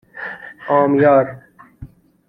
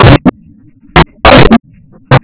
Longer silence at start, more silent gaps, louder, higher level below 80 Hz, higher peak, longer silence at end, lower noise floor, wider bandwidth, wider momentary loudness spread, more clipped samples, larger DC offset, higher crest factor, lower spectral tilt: first, 0.15 s vs 0 s; neither; second, -15 LUFS vs -6 LUFS; second, -52 dBFS vs -18 dBFS; about the same, -2 dBFS vs 0 dBFS; first, 0.4 s vs 0.05 s; about the same, -40 dBFS vs -38 dBFS; first, 4.5 kHz vs 4 kHz; first, 17 LU vs 7 LU; second, under 0.1% vs 20%; neither; first, 16 dB vs 6 dB; about the same, -10 dB/octave vs -10.5 dB/octave